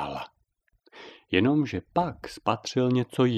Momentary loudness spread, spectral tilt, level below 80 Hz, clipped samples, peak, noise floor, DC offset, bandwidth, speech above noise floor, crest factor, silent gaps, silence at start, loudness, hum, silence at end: 22 LU; -6.5 dB/octave; -60 dBFS; under 0.1%; -6 dBFS; -71 dBFS; under 0.1%; 12.5 kHz; 46 dB; 22 dB; none; 0 s; -27 LUFS; none; 0 s